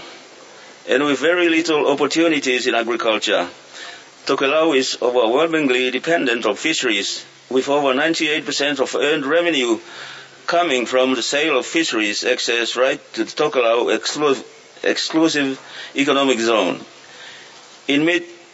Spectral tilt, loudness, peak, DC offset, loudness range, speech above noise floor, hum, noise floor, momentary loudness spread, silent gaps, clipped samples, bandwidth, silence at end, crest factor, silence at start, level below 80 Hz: -2.5 dB/octave; -18 LUFS; -2 dBFS; under 0.1%; 2 LU; 24 dB; none; -42 dBFS; 13 LU; none; under 0.1%; 8 kHz; 0.15 s; 16 dB; 0 s; -74 dBFS